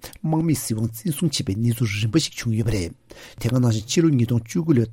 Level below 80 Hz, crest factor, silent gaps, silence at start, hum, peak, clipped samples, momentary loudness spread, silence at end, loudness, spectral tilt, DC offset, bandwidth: -44 dBFS; 16 dB; none; 0.05 s; none; -6 dBFS; under 0.1%; 6 LU; 0 s; -22 LUFS; -5.5 dB/octave; under 0.1%; 16.5 kHz